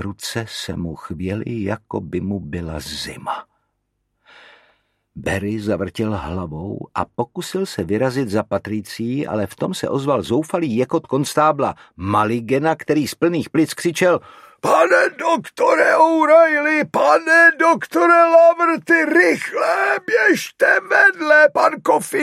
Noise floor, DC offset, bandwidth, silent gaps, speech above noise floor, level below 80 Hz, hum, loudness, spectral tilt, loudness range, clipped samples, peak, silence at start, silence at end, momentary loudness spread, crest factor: -72 dBFS; under 0.1%; 15 kHz; none; 54 dB; -50 dBFS; none; -17 LUFS; -5 dB/octave; 14 LU; under 0.1%; 0 dBFS; 0 s; 0 s; 15 LU; 16 dB